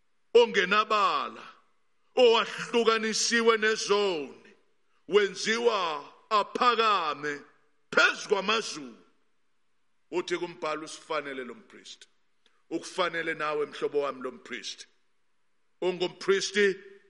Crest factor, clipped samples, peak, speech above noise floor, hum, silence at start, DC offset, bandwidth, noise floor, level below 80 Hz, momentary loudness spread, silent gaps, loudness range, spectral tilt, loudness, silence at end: 22 dB; under 0.1%; -8 dBFS; 52 dB; none; 0.35 s; under 0.1%; 11.5 kHz; -80 dBFS; -84 dBFS; 16 LU; none; 10 LU; -2.5 dB/octave; -27 LUFS; 0.2 s